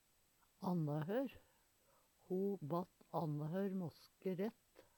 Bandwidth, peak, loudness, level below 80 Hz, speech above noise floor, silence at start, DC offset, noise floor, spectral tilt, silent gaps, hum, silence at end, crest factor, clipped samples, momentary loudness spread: 19 kHz; -28 dBFS; -44 LUFS; -82 dBFS; 33 dB; 0.6 s; under 0.1%; -76 dBFS; -8.5 dB/octave; none; none; 0.15 s; 16 dB; under 0.1%; 7 LU